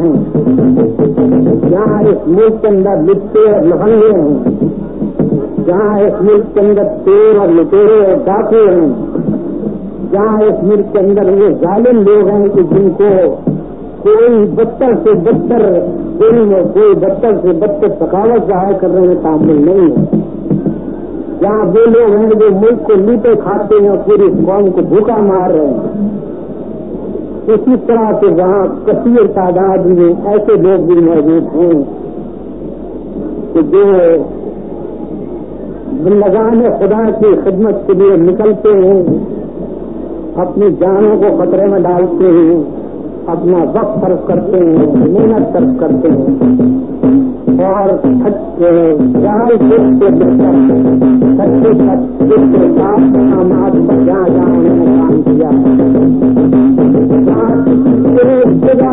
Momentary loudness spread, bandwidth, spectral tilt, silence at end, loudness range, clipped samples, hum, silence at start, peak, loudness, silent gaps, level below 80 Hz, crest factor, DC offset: 13 LU; 3.8 kHz; -14.5 dB/octave; 0 s; 4 LU; under 0.1%; none; 0 s; 0 dBFS; -9 LUFS; none; -38 dBFS; 8 dB; 2%